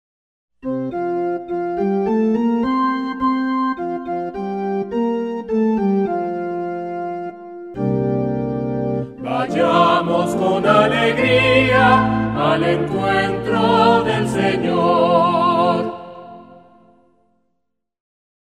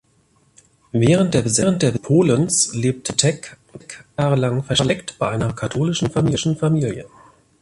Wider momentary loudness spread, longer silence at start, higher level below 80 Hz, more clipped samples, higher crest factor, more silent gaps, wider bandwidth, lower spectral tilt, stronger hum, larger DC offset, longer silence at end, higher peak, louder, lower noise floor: about the same, 11 LU vs 10 LU; second, 0.65 s vs 0.95 s; about the same, -48 dBFS vs -48 dBFS; neither; about the same, 18 dB vs 20 dB; neither; about the same, 12.5 kHz vs 11.5 kHz; first, -6.5 dB/octave vs -5 dB/octave; neither; neither; first, 2.05 s vs 0.55 s; about the same, 0 dBFS vs 0 dBFS; about the same, -18 LUFS vs -19 LUFS; first, -74 dBFS vs -59 dBFS